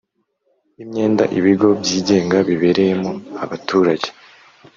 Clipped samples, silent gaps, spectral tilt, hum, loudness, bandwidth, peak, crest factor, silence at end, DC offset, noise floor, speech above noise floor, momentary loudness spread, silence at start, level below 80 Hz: under 0.1%; none; -5.5 dB/octave; none; -17 LUFS; 7.6 kHz; -2 dBFS; 16 dB; 0.65 s; under 0.1%; -66 dBFS; 50 dB; 12 LU; 0.8 s; -58 dBFS